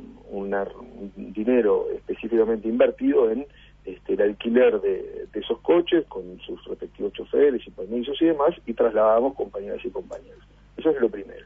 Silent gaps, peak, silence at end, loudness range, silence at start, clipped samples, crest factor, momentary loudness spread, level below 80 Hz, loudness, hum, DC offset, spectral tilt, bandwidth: none; -6 dBFS; 0.05 s; 2 LU; 0 s; under 0.1%; 18 dB; 17 LU; -52 dBFS; -23 LUFS; 50 Hz at -55 dBFS; under 0.1%; -8 dB/octave; 3.7 kHz